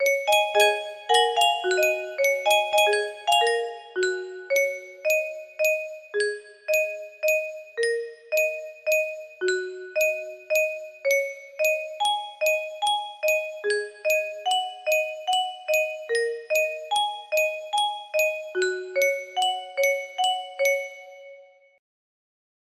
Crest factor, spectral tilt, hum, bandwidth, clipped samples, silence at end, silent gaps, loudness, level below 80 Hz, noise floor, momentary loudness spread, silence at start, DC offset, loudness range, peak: 20 dB; 0.5 dB/octave; none; 16 kHz; under 0.1%; 1.35 s; none; -24 LUFS; -76 dBFS; -50 dBFS; 8 LU; 0 s; under 0.1%; 4 LU; -6 dBFS